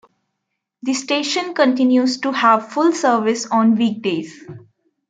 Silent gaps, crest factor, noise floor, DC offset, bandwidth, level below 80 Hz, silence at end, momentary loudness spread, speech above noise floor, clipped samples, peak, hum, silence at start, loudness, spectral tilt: none; 16 dB; -77 dBFS; under 0.1%; 9.2 kHz; -70 dBFS; 0.5 s; 8 LU; 60 dB; under 0.1%; -2 dBFS; none; 0.85 s; -17 LUFS; -4 dB/octave